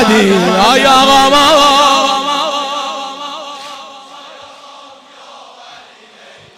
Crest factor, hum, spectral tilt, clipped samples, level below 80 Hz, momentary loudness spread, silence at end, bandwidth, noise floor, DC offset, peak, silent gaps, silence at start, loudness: 12 dB; none; -3 dB/octave; under 0.1%; -44 dBFS; 22 LU; 0.85 s; 16.5 kHz; -39 dBFS; under 0.1%; 0 dBFS; none; 0 s; -9 LUFS